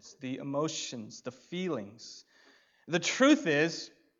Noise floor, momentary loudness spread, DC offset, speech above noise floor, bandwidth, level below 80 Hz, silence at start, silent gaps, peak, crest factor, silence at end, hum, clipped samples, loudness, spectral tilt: -64 dBFS; 21 LU; under 0.1%; 32 dB; 7.8 kHz; -84 dBFS; 0.05 s; none; -12 dBFS; 20 dB; 0.3 s; none; under 0.1%; -30 LUFS; -4 dB/octave